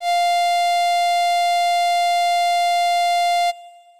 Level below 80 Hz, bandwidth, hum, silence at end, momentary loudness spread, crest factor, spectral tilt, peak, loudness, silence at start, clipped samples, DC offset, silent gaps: -70 dBFS; 15.5 kHz; none; 0.3 s; 1 LU; 4 dB; 4.5 dB/octave; -14 dBFS; -18 LUFS; 0 s; under 0.1%; 0.4%; none